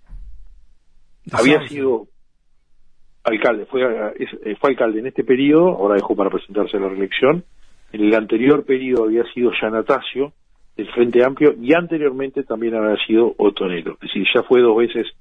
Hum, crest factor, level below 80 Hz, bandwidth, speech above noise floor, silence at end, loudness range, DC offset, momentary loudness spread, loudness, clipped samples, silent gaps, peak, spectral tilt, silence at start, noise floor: none; 16 dB; -50 dBFS; 10 kHz; 38 dB; 0.1 s; 4 LU; under 0.1%; 11 LU; -18 LUFS; under 0.1%; none; -2 dBFS; -6 dB/octave; 0.1 s; -54 dBFS